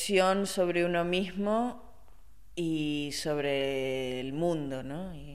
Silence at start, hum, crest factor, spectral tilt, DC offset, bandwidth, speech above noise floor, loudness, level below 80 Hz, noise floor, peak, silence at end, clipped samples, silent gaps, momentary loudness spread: 0 s; none; 18 dB; -5 dB/octave; 0.4%; 15 kHz; 27 dB; -31 LUFS; -56 dBFS; -57 dBFS; -12 dBFS; 0 s; under 0.1%; none; 10 LU